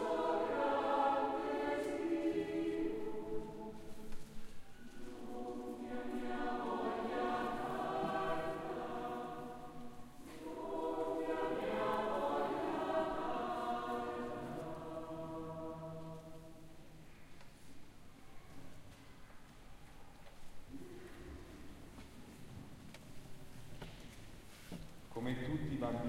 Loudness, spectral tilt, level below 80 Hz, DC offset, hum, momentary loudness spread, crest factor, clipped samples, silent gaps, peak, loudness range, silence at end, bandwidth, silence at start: -40 LUFS; -6 dB/octave; -60 dBFS; under 0.1%; none; 22 LU; 18 dB; under 0.1%; none; -24 dBFS; 18 LU; 0 s; 16 kHz; 0 s